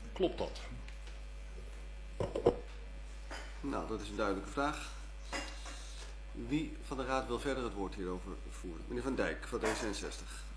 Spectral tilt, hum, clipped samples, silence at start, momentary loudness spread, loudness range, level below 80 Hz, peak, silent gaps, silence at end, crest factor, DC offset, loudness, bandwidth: -5 dB/octave; none; under 0.1%; 0 s; 14 LU; 2 LU; -46 dBFS; -16 dBFS; none; 0 s; 24 dB; under 0.1%; -40 LUFS; 11 kHz